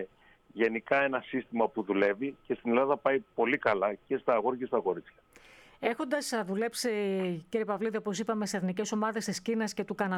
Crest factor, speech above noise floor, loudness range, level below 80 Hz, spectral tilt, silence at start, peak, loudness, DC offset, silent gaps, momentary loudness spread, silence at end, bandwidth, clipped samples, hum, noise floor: 18 dB; 26 dB; 4 LU; -72 dBFS; -4.5 dB/octave; 0 s; -12 dBFS; -31 LUFS; under 0.1%; none; 7 LU; 0 s; 16 kHz; under 0.1%; none; -57 dBFS